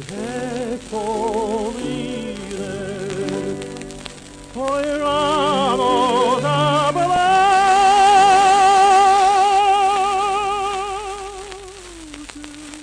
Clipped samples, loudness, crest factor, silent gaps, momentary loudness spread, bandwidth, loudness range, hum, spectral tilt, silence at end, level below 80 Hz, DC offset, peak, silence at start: under 0.1%; -17 LUFS; 14 dB; none; 22 LU; 11 kHz; 12 LU; none; -3.5 dB/octave; 0 s; -46 dBFS; under 0.1%; -4 dBFS; 0 s